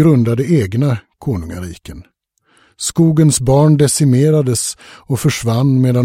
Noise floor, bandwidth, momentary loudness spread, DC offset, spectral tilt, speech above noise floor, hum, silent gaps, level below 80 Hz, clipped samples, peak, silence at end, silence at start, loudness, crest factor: -57 dBFS; 16 kHz; 12 LU; under 0.1%; -6 dB/octave; 44 dB; none; none; -40 dBFS; under 0.1%; 0 dBFS; 0 s; 0 s; -14 LUFS; 12 dB